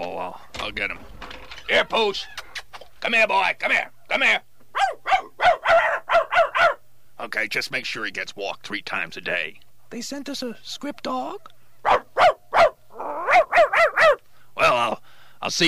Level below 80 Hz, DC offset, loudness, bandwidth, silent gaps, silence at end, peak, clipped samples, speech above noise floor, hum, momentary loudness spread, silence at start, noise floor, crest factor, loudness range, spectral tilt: -54 dBFS; 0.9%; -21 LUFS; 15.5 kHz; none; 0 s; -6 dBFS; under 0.1%; 16 dB; none; 17 LU; 0 s; -42 dBFS; 18 dB; 9 LU; -2.5 dB/octave